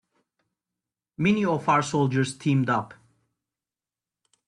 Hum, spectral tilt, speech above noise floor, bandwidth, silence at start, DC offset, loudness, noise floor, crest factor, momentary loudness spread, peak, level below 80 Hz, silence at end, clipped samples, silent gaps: none; -6 dB/octave; over 67 dB; 11 kHz; 1.2 s; under 0.1%; -24 LUFS; under -90 dBFS; 18 dB; 5 LU; -8 dBFS; -64 dBFS; 1.55 s; under 0.1%; none